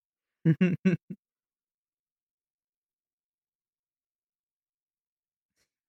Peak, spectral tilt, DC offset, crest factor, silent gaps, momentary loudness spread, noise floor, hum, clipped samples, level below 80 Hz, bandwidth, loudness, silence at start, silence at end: -12 dBFS; -9 dB/octave; under 0.1%; 22 dB; 1.03-1.08 s; 22 LU; under -90 dBFS; none; under 0.1%; -76 dBFS; 6.2 kHz; -28 LUFS; 0.45 s; 4.75 s